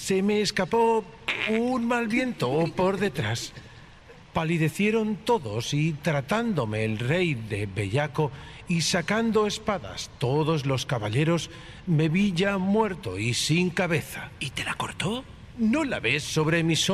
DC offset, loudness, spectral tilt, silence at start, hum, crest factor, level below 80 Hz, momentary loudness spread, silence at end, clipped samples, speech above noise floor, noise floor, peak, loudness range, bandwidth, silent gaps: under 0.1%; -26 LUFS; -5 dB/octave; 0 s; none; 16 dB; -52 dBFS; 7 LU; 0 s; under 0.1%; 23 dB; -49 dBFS; -8 dBFS; 2 LU; 14.5 kHz; none